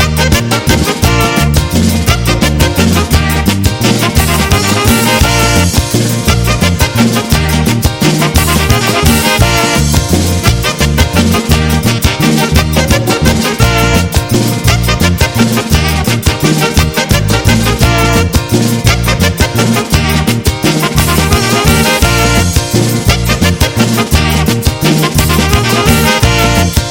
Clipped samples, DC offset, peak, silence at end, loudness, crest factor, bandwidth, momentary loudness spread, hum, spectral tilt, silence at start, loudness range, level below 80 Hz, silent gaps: 0.3%; under 0.1%; 0 dBFS; 0 s; -9 LUFS; 10 dB; 17.5 kHz; 3 LU; none; -4.5 dB/octave; 0 s; 1 LU; -18 dBFS; none